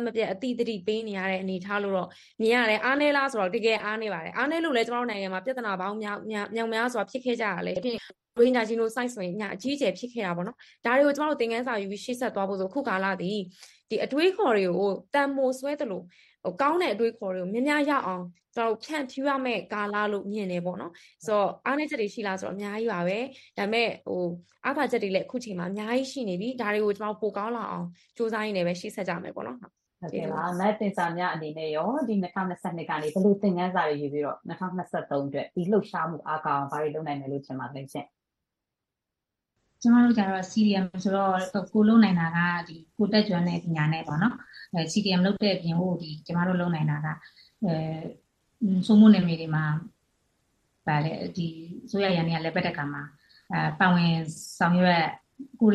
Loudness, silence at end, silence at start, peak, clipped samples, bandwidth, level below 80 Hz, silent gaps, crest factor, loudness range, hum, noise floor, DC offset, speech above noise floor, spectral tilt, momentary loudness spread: -27 LUFS; 0 s; 0 s; -6 dBFS; under 0.1%; 12.5 kHz; -68 dBFS; none; 20 dB; 6 LU; none; -87 dBFS; under 0.1%; 60 dB; -6.5 dB/octave; 11 LU